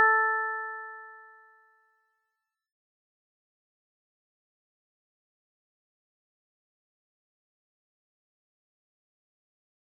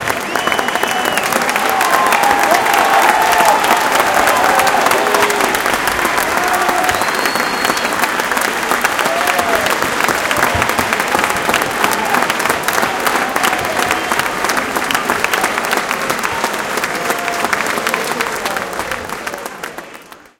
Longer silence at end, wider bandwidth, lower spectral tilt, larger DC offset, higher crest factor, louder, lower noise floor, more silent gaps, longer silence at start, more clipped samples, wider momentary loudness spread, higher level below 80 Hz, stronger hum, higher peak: first, 8.75 s vs 0.2 s; second, 1.9 kHz vs over 20 kHz; second, 2.5 dB/octave vs -2 dB/octave; neither; first, 26 dB vs 16 dB; second, -28 LUFS vs -14 LUFS; first, -84 dBFS vs -37 dBFS; neither; about the same, 0 s vs 0 s; neither; first, 24 LU vs 6 LU; second, under -90 dBFS vs -44 dBFS; neither; second, -12 dBFS vs 0 dBFS